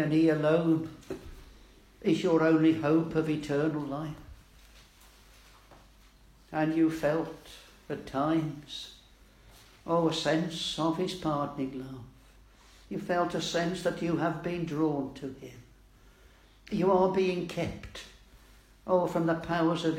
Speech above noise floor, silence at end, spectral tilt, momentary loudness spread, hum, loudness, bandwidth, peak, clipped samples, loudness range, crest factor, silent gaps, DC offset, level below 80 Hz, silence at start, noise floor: 29 dB; 0 s; -6 dB/octave; 19 LU; none; -29 LUFS; 14 kHz; -12 dBFS; under 0.1%; 5 LU; 18 dB; none; under 0.1%; -58 dBFS; 0 s; -58 dBFS